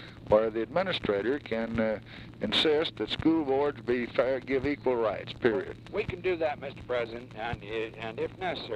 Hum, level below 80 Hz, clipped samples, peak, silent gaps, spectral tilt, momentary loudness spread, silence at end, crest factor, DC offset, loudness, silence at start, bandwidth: none; -54 dBFS; under 0.1%; -10 dBFS; none; -6 dB/octave; 10 LU; 0 s; 20 dB; under 0.1%; -30 LUFS; 0 s; 11.5 kHz